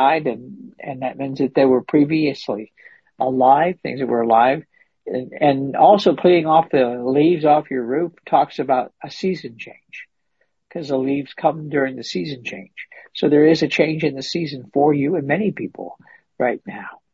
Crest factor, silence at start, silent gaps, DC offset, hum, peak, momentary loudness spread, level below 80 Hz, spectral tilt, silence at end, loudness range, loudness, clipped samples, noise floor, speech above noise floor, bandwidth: 18 dB; 0 s; none; under 0.1%; none; -2 dBFS; 19 LU; -64 dBFS; -7 dB/octave; 0.2 s; 8 LU; -18 LUFS; under 0.1%; -70 dBFS; 51 dB; 7.6 kHz